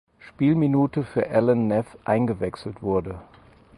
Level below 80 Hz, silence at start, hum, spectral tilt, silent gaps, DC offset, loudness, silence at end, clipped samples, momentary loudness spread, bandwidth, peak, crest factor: -52 dBFS; 0.25 s; none; -9.5 dB/octave; none; under 0.1%; -23 LUFS; 0.55 s; under 0.1%; 10 LU; 11.5 kHz; -6 dBFS; 18 dB